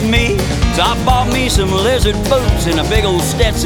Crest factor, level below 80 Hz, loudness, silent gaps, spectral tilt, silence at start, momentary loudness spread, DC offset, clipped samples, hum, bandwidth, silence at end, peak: 12 dB; -18 dBFS; -14 LUFS; none; -4.5 dB/octave; 0 s; 2 LU; under 0.1%; under 0.1%; none; 18.5 kHz; 0 s; 0 dBFS